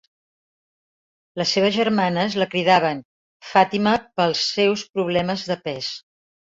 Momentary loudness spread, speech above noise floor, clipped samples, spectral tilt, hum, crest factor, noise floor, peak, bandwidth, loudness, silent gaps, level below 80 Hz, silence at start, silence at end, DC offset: 10 LU; over 70 dB; under 0.1%; -4.5 dB/octave; none; 20 dB; under -90 dBFS; -2 dBFS; 7.8 kHz; -20 LUFS; 3.05-3.40 s, 4.89-4.94 s; -60 dBFS; 1.35 s; 0.6 s; under 0.1%